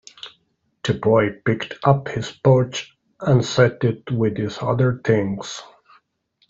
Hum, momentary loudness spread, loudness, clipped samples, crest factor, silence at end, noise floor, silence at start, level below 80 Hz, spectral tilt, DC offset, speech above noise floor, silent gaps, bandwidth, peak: none; 15 LU; -20 LUFS; under 0.1%; 18 dB; 0.85 s; -67 dBFS; 0.25 s; -54 dBFS; -6.5 dB/octave; under 0.1%; 48 dB; none; 7.8 kHz; -2 dBFS